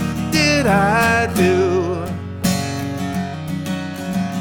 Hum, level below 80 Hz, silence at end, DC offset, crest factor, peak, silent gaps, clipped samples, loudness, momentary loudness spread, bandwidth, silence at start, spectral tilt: none; -40 dBFS; 0 s; under 0.1%; 16 dB; -2 dBFS; none; under 0.1%; -18 LUFS; 10 LU; 19 kHz; 0 s; -5 dB/octave